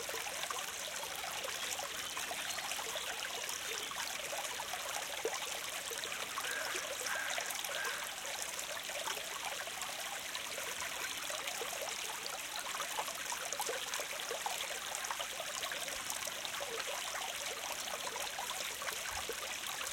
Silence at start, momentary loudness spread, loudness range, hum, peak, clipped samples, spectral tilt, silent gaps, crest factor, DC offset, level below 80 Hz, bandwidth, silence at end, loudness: 0 s; 2 LU; 1 LU; none; -18 dBFS; under 0.1%; 0.5 dB/octave; none; 24 dB; under 0.1%; -72 dBFS; 17 kHz; 0 s; -39 LUFS